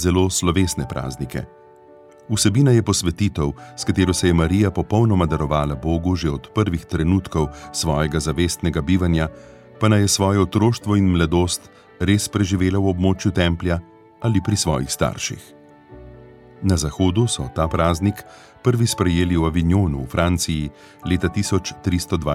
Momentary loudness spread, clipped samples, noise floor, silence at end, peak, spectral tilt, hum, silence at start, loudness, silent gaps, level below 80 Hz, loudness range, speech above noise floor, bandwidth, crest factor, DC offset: 9 LU; under 0.1%; -46 dBFS; 0 s; -2 dBFS; -5.5 dB/octave; none; 0 s; -20 LUFS; none; -36 dBFS; 4 LU; 27 dB; 15.5 kHz; 18 dB; under 0.1%